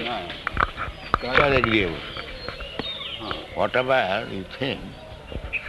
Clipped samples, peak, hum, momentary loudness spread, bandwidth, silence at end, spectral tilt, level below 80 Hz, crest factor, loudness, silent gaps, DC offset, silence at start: under 0.1%; -2 dBFS; none; 15 LU; 12 kHz; 0 s; -6 dB/octave; -40 dBFS; 24 dB; -25 LUFS; none; under 0.1%; 0 s